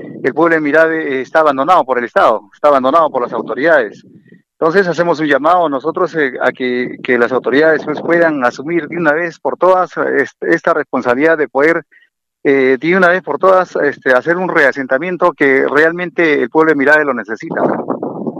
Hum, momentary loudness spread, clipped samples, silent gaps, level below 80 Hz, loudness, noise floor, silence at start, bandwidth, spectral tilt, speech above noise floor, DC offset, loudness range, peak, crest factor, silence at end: none; 7 LU; under 0.1%; none; -62 dBFS; -13 LUFS; -44 dBFS; 0 s; 10 kHz; -6.5 dB/octave; 32 dB; under 0.1%; 2 LU; 0 dBFS; 12 dB; 0 s